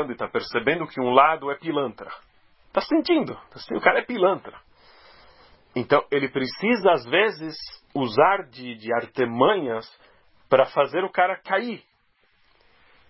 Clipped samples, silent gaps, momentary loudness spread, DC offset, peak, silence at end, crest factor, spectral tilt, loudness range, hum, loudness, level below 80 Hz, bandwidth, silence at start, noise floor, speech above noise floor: under 0.1%; none; 14 LU; under 0.1%; -2 dBFS; 1.3 s; 24 dB; -9 dB/octave; 2 LU; none; -23 LUFS; -64 dBFS; 5.8 kHz; 0 s; -65 dBFS; 42 dB